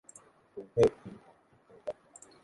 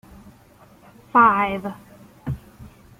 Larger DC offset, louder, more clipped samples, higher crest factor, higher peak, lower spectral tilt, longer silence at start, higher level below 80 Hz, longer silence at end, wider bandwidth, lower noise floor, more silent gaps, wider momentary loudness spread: neither; second, -31 LUFS vs -19 LUFS; neither; about the same, 24 dB vs 20 dB; second, -12 dBFS vs -4 dBFS; about the same, -6.5 dB/octave vs -7 dB/octave; second, 0.55 s vs 1.15 s; second, -62 dBFS vs -50 dBFS; first, 0.5 s vs 0.35 s; second, 11.5 kHz vs 16 kHz; first, -61 dBFS vs -51 dBFS; neither; first, 25 LU vs 20 LU